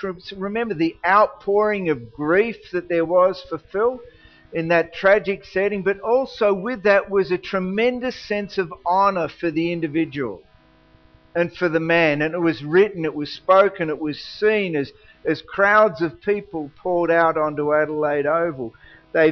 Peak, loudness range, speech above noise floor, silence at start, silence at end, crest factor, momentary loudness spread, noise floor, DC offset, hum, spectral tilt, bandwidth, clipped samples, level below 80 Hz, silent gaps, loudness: -4 dBFS; 3 LU; 33 dB; 0 s; 0 s; 18 dB; 11 LU; -53 dBFS; under 0.1%; none; -4 dB/octave; 6.4 kHz; under 0.1%; -54 dBFS; none; -20 LUFS